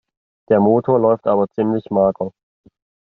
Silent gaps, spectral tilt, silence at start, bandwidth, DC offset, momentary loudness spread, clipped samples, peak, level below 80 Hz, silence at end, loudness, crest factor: none; -9 dB/octave; 0.5 s; 4.1 kHz; under 0.1%; 6 LU; under 0.1%; -4 dBFS; -60 dBFS; 0.85 s; -17 LUFS; 14 dB